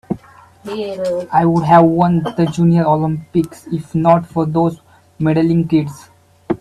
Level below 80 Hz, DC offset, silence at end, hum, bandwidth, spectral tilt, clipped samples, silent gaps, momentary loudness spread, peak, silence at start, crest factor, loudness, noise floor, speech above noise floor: -48 dBFS; under 0.1%; 0.05 s; none; 11.5 kHz; -8.5 dB/octave; under 0.1%; none; 14 LU; 0 dBFS; 0.1 s; 16 dB; -15 LUFS; -41 dBFS; 26 dB